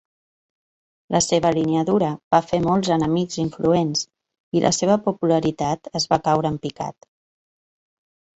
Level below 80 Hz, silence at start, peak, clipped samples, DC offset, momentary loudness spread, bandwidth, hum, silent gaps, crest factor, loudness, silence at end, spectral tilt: -54 dBFS; 1.1 s; -4 dBFS; under 0.1%; under 0.1%; 7 LU; 8.6 kHz; none; 2.23-2.31 s, 4.40-4.52 s; 18 dB; -21 LUFS; 1.45 s; -5 dB/octave